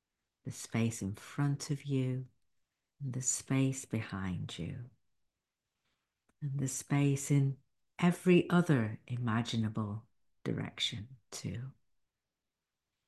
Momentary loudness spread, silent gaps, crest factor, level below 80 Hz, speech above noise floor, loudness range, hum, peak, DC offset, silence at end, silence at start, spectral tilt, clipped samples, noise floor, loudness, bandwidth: 17 LU; none; 20 dB; -64 dBFS; over 56 dB; 8 LU; none; -14 dBFS; under 0.1%; 1.35 s; 0.45 s; -5.5 dB/octave; under 0.1%; under -90 dBFS; -34 LUFS; 12.5 kHz